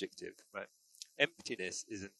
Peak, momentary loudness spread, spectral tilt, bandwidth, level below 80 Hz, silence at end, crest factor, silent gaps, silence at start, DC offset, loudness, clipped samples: -14 dBFS; 18 LU; -2 dB/octave; 12 kHz; -76 dBFS; 0.1 s; 28 dB; none; 0 s; under 0.1%; -39 LUFS; under 0.1%